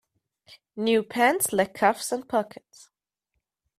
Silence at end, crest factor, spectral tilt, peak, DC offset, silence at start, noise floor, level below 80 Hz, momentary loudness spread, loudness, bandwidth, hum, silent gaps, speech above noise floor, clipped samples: 1.3 s; 22 dB; -3 dB/octave; -6 dBFS; under 0.1%; 0.5 s; -81 dBFS; -70 dBFS; 9 LU; -24 LUFS; 16 kHz; none; none; 56 dB; under 0.1%